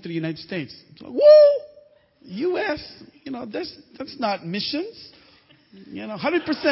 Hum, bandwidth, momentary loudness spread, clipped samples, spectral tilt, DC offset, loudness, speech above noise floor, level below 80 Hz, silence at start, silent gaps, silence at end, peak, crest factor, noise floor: none; 5.8 kHz; 25 LU; under 0.1%; -9 dB/octave; under 0.1%; -20 LUFS; 34 dB; -62 dBFS; 0.05 s; none; 0 s; -4 dBFS; 18 dB; -55 dBFS